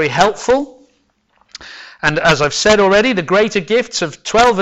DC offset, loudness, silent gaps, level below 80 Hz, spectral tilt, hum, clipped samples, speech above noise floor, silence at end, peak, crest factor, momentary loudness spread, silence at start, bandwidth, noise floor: under 0.1%; -14 LUFS; none; -42 dBFS; -3.5 dB/octave; none; under 0.1%; 46 dB; 0 s; 0 dBFS; 14 dB; 20 LU; 0 s; 10.5 kHz; -59 dBFS